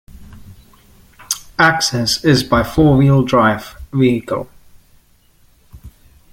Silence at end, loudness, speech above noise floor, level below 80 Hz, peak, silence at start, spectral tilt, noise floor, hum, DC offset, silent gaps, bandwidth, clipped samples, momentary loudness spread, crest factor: 0.45 s; -15 LUFS; 38 dB; -38 dBFS; 0 dBFS; 0.2 s; -5 dB/octave; -52 dBFS; none; under 0.1%; none; 17 kHz; under 0.1%; 12 LU; 16 dB